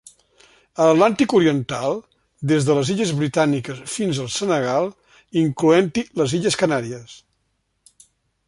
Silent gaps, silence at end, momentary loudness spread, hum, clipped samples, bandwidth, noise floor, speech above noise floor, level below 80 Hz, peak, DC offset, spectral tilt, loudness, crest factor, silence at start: none; 1.3 s; 11 LU; none; under 0.1%; 11.5 kHz; -70 dBFS; 51 dB; -58 dBFS; -2 dBFS; under 0.1%; -5.5 dB/octave; -20 LUFS; 20 dB; 0.8 s